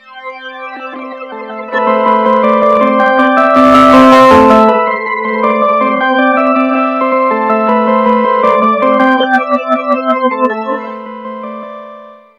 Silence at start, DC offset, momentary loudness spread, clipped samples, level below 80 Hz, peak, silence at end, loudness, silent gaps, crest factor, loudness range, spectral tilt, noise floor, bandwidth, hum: 0.1 s; under 0.1%; 20 LU; 1%; -44 dBFS; 0 dBFS; 0.25 s; -9 LUFS; none; 10 dB; 6 LU; -5.5 dB/octave; -33 dBFS; 12 kHz; none